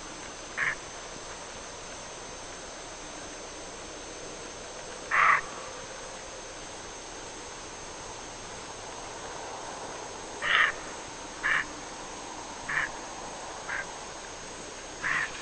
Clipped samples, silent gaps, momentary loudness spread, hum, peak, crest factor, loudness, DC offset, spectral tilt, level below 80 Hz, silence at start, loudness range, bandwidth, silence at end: under 0.1%; none; 14 LU; none; -6 dBFS; 28 dB; -33 LUFS; under 0.1%; -1 dB/octave; -56 dBFS; 0 s; 10 LU; 9.2 kHz; 0 s